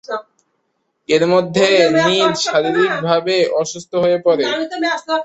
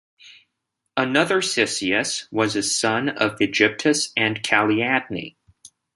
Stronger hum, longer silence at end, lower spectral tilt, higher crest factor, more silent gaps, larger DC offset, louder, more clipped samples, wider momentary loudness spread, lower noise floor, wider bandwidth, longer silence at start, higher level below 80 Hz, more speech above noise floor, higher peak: neither; second, 0 s vs 0.65 s; about the same, -4 dB/octave vs -3 dB/octave; second, 14 dB vs 20 dB; neither; neither; first, -15 LUFS vs -20 LUFS; neither; about the same, 8 LU vs 6 LU; second, -69 dBFS vs -78 dBFS; second, 8.2 kHz vs 11.5 kHz; second, 0.1 s vs 0.25 s; about the same, -60 dBFS vs -62 dBFS; second, 53 dB vs 57 dB; about the same, -2 dBFS vs -2 dBFS